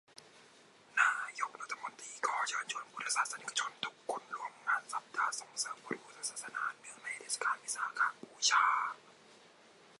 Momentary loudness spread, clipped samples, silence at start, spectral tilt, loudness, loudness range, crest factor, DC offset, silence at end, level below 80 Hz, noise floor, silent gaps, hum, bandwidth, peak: 12 LU; under 0.1%; 0.2 s; 1 dB/octave; -36 LUFS; 4 LU; 22 dB; under 0.1%; 0.65 s; under -90 dBFS; -62 dBFS; none; none; 11.5 kHz; -16 dBFS